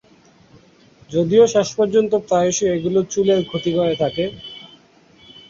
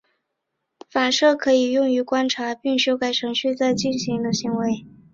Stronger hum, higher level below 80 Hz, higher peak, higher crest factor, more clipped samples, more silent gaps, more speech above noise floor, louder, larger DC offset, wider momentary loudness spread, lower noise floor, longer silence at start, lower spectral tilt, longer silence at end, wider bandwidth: neither; first, -54 dBFS vs -62 dBFS; about the same, -2 dBFS vs -4 dBFS; about the same, 18 dB vs 16 dB; neither; neither; second, 34 dB vs 58 dB; first, -18 LUFS vs -21 LUFS; neither; first, 11 LU vs 7 LU; second, -51 dBFS vs -78 dBFS; first, 1.1 s vs 0.95 s; about the same, -5 dB/octave vs -4 dB/octave; first, 0.85 s vs 0.25 s; about the same, 7.6 kHz vs 7.6 kHz